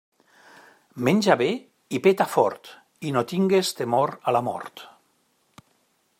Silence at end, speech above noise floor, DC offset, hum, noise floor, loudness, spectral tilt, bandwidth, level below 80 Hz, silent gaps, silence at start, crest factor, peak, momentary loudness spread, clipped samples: 1.3 s; 45 dB; under 0.1%; none; -67 dBFS; -23 LUFS; -5.5 dB/octave; 16 kHz; -72 dBFS; none; 0.95 s; 22 dB; -4 dBFS; 15 LU; under 0.1%